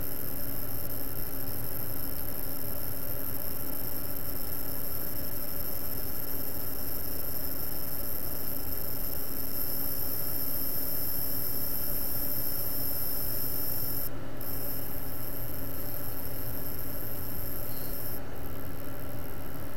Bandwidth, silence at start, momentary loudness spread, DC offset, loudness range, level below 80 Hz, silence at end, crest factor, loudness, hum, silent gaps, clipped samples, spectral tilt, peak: over 20 kHz; 0 s; 6 LU; 5%; 6 LU; -46 dBFS; 0 s; 18 dB; -33 LUFS; none; none; under 0.1%; -4 dB/octave; -16 dBFS